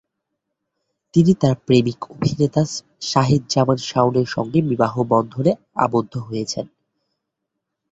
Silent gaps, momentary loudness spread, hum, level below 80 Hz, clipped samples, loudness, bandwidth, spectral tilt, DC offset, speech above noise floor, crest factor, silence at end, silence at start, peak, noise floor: none; 10 LU; none; -54 dBFS; under 0.1%; -19 LUFS; 8 kHz; -6.5 dB/octave; under 0.1%; 61 dB; 18 dB; 1.25 s; 1.15 s; -2 dBFS; -79 dBFS